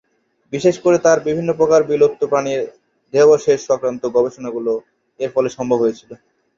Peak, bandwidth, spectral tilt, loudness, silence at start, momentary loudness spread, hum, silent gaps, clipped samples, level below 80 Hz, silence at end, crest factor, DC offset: -2 dBFS; 7.6 kHz; -5.5 dB/octave; -17 LUFS; 0.5 s; 11 LU; none; none; under 0.1%; -58 dBFS; 0.45 s; 16 dB; under 0.1%